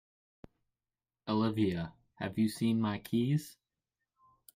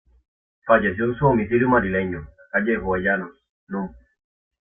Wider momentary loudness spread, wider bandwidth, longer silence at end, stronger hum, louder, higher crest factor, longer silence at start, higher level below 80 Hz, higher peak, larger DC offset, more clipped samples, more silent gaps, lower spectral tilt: about the same, 13 LU vs 15 LU; first, 16 kHz vs 3.6 kHz; first, 1.05 s vs 0.75 s; neither; second, -33 LUFS vs -21 LUFS; about the same, 16 dB vs 20 dB; first, 1.25 s vs 0.65 s; second, -68 dBFS vs -46 dBFS; second, -18 dBFS vs -2 dBFS; neither; neither; second, none vs 3.49-3.67 s; second, -7 dB/octave vs -11.5 dB/octave